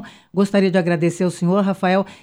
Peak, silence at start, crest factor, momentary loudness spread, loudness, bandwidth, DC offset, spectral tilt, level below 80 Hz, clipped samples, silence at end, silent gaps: -4 dBFS; 0 s; 14 dB; 4 LU; -18 LUFS; 11.5 kHz; under 0.1%; -7 dB/octave; -62 dBFS; under 0.1%; 0.1 s; none